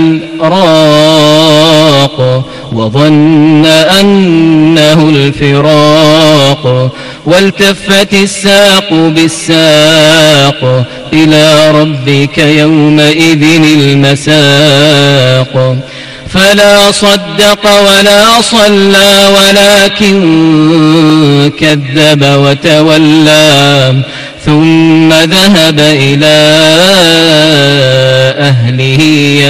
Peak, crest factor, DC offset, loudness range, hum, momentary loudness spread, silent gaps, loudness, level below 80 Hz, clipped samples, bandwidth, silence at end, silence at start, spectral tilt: 0 dBFS; 4 dB; under 0.1%; 2 LU; none; 6 LU; none; -4 LUFS; -36 dBFS; 4%; 15.5 kHz; 0 s; 0 s; -4.5 dB/octave